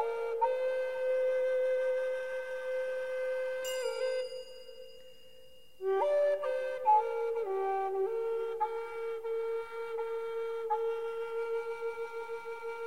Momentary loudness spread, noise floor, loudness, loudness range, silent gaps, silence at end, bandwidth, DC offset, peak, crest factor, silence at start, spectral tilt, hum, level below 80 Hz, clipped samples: 10 LU; -59 dBFS; -34 LUFS; 5 LU; none; 0 s; 16 kHz; 0.3%; -18 dBFS; 16 dB; 0 s; -2.5 dB/octave; none; -74 dBFS; under 0.1%